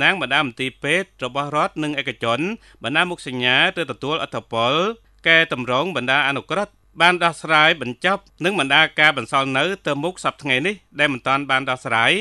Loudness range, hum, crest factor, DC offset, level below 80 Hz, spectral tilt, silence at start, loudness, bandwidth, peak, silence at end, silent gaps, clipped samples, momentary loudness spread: 4 LU; none; 20 dB; under 0.1%; -58 dBFS; -4 dB/octave; 0 s; -19 LUFS; 12 kHz; 0 dBFS; 0 s; none; under 0.1%; 10 LU